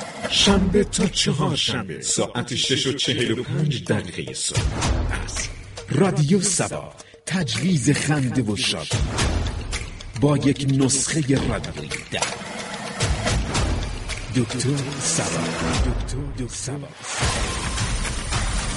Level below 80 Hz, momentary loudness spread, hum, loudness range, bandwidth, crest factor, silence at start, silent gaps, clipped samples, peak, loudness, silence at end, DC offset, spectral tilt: -32 dBFS; 11 LU; none; 3 LU; 11.5 kHz; 18 dB; 0 s; none; under 0.1%; -4 dBFS; -22 LUFS; 0 s; under 0.1%; -4 dB/octave